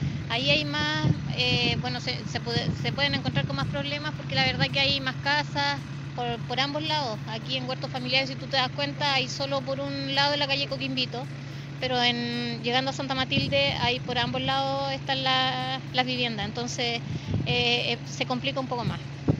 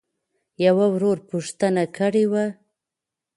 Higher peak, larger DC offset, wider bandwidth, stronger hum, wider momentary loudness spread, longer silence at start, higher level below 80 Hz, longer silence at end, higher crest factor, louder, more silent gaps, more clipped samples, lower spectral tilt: about the same, -6 dBFS vs -6 dBFS; neither; second, 8 kHz vs 11.5 kHz; neither; about the same, 8 LU vs 8 LU; second, 0 s vs 0.6 s; first, -52 dBFS vs -68 dBFS; second, 0 s vs 0.85 s; about the same, 22 dB vs 18 dB; second, -26 LUFS vs -21 LUFS; neither; neither; second, -4.5 dB/octave vs -6.5 dB/octave